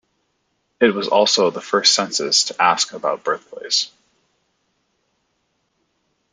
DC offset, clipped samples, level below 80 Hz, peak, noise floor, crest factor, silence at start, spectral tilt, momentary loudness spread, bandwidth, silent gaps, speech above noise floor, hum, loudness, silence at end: under 0.1%; under 0.1%; -72 dBFS; 0 dBFS; -70 dBFS; 20 dB; 0.8 s; -1.5 dB/octave; 9 LU; 11 kHz; none; 51 dB; none; -17 LUFS; 2.45 s